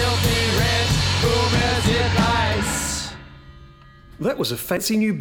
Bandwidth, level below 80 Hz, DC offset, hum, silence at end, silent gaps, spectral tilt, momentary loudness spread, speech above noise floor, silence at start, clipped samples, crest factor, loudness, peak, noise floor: 19 kHz; -34 dBFS; under 0.1%; none; 0 s; none; -4 dB/octave; 8 LU; 23 dB; 0 s; under 0.1%; 14 dB; -20 LUFS; -6 dBFS; -45 dBFS